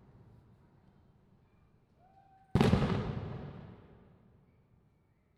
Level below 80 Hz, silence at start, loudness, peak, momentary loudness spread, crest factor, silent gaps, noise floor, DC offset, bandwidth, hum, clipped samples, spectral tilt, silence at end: -50 dBFS; 2.55 s; -32 LUFS; -12 dBFS; 25 LU; 26 dB; none; -70 dBFS; under 0.1%; 12.5 kHz; none; under 0.1%; -7.5 dB/octave; 1.6 s